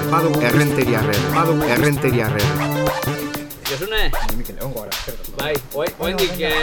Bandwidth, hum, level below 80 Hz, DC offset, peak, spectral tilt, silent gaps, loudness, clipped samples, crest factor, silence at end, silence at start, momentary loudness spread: 18 kHz; none; -30 dBFS; under 0.1%; -2 dBFS; -5 dB/octave; none; -19 LUFS; under 0.1%; 16 dB; 0 s; 0 s; 10 LU